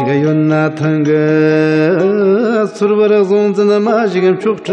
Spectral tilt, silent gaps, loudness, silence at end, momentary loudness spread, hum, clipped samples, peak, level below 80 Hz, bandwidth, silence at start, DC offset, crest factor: -8 dB/octave; none; -12 LUFS; 0 s; 3 LU; none; under 0.1%; 0 dBFS; -66 dBFS; 8.6 kHz; 0 s; under 0.1%; 10 dB